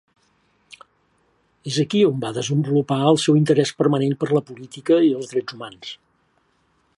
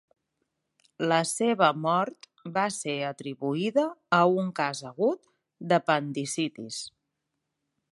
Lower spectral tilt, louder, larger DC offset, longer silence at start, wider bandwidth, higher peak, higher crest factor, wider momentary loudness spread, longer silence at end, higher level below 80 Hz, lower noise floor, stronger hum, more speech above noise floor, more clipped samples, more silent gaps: first, -6 dB/octave vs -4.5 dB/octave; first, -20 LUFS vs -27 LUFS; neither; first, 1.65 s vs 1 s; about the same, 11.5 kHz vs 11.5 kHz; first, -4 dBFS vs -8 dBFS; about the same, 18 dB vs 22 dB; first, 18 LU vs 14 LU; about the same, 1.05 s vs 1 s; first, -68 dBFS vs -78 dBFS; second, -64 dBFS vs -82 dBFS; neither; second, 45 dB vs 55 dB; neither; neither